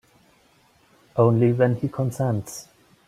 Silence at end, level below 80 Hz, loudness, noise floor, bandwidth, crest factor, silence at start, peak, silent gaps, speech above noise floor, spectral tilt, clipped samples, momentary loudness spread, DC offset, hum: 0.45 s; -60 dBFS; -22 LUFS; -59 dBFS; 14.5 kHz; 20 dB; 1.15 s; -4 dBFS; none; 38 dB; -8 dB/octave; under 0.1%; 14 LU; under 0.1%; none